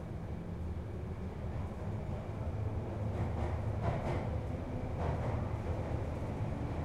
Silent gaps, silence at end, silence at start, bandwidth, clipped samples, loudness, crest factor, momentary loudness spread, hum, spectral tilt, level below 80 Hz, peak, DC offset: none; 0 s; 0 s; 10.5 kHz; under 0.1%; -39 LUFS; 18 dB; 6 LU; none; -8.5 dB/octave; -44 dBFS; -20 dBFS; under 0.1%